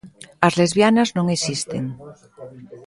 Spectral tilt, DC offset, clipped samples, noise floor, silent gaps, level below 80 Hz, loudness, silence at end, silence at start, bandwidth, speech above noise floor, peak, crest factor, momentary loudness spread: -5 dB/octave; under 0.1%; under 0.1%; -39 dBFS; none; -58 dBFS; -19 LUFS; 0.05 s; 0.05 s; 11.5 kHz; 20 dB; 0 dBFS; 20 dB; 23 LU